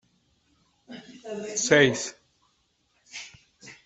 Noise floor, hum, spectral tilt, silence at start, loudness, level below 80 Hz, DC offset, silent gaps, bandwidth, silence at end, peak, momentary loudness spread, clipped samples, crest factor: -70 dBFS; none; -3 dB/octave; 0.9 s; -23 LUFS; -68 dBFS; under 0.1%; none; 8.4 kHz; 0.1 s; -4 dBFS; 26 LU; under 0.1%; 26 dB